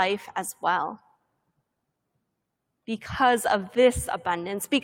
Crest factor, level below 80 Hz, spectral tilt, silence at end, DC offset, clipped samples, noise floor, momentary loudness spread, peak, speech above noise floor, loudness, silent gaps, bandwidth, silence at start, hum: 20 dB; -52 dBFS; -3.5 dB/octave; 0 s; under 0.1%; under 0.1%; -80 dBFS; 14 LU; -8 dBFS; 55 dB; -25 LUFS; none; 16.5 kHz; 0 s; none